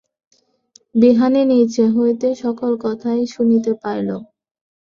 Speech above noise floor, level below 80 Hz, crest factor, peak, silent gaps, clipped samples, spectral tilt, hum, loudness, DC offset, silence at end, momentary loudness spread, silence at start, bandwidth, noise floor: 39 dB; -62 dBFS; 16 dB; -2 dBFS; none; under 0.1%; -7 dB/octave; none; -17 LUFS; under 0.1%; 0.6 s; 9 LU; 0.95 s; 7.4 kHz; -54 dBFS